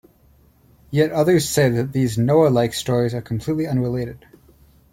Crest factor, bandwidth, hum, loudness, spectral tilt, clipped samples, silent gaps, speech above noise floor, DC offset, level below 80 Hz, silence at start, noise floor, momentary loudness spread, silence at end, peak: 16 dB; 16.5 kHz; none; -19 LUFS; -6 dB/octave; under 0.1%; none; 36 dB; under 0.1%; -50 dBFS; 0.9 s; -54 dBFS; 9 LU; 0.75 s; -4 dBFS